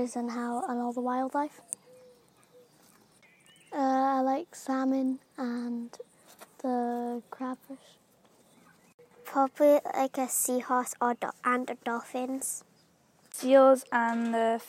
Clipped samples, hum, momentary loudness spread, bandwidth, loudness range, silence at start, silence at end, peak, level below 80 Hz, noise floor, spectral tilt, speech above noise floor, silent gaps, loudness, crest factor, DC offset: under 0.1%; none; 16 LU; 16 kHz; 9 LU; 0 s; 0 s; -10 dBFS; -86 dBFS; -65 dBFS; -3 dB/octave; 36 dB; 8.94-8.98 s; -29 LUFS; 20 dB; under 0.1%